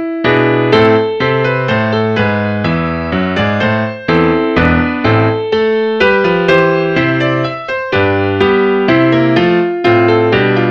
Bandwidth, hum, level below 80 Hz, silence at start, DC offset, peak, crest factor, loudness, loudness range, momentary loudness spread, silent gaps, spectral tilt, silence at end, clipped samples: 7.2 kHz; none; -36 dBFS; 0 s; 0.3%; 0 dBFS; 12 dB; -12 LUFS; 2 LU; 5 LU; none; -7.5 dB/octave; 0 s; under 0.1%